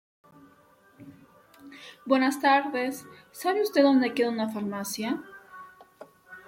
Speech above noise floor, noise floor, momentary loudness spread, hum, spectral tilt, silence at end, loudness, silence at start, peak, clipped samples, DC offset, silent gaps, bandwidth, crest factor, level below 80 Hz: 33 dB; -59 dBFS; 24 LU; none; -4 dB/octave; 0.05 s; -26 LUFS; 1 s; -10 dBFS; under 0.1%; under 0.1%; none; 16.5 kHz; 20 dB; -76 dBFS